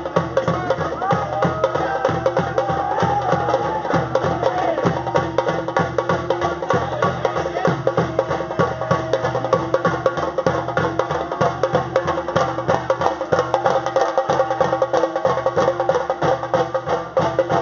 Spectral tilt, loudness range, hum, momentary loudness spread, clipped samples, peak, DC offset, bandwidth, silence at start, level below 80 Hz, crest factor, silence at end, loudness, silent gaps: -5 dB/octave; 1 LU; none; 3 LU; under 0.1%; 0 dBFS; under 0.1%; 7.2 kHz; 0 s; -46 dBFS; 20 dB; 0 s; -20 LUFS; none